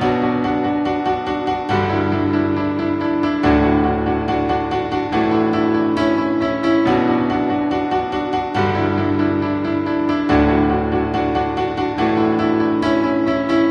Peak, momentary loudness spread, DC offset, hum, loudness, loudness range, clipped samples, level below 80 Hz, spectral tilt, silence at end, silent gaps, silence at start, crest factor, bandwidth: -2 dBFS; 5 LU; under 0.1%; none; -18 LUFS; 1 LU; under 0.1%; -36 dBFS; -7.5 dB/octave; 0 s; none; 0 s; 16 dB; 7.2 kHz